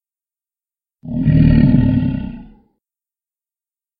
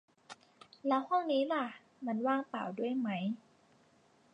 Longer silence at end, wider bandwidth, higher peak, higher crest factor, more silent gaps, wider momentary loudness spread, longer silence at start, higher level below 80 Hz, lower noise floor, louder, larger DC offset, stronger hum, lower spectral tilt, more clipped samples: first, 1.55 s vs 1 s; second, 4.9 kHz vs 9.4 kHz; first, 0 dBFS vs -18 dBFS; about the same, 18 dB vs 18 dB; neither; second, 15 LU vs 21 LU; first, 1.05 s vs 0.3 s; first, -28 dBFS vs -90 dBFS; first, under -90 dBFS vs -67 dBFS; first, -14 LUFS vs -35 LUFS; neither; neither; first, -13.5 dB/octave vs -7 dB/octave; neither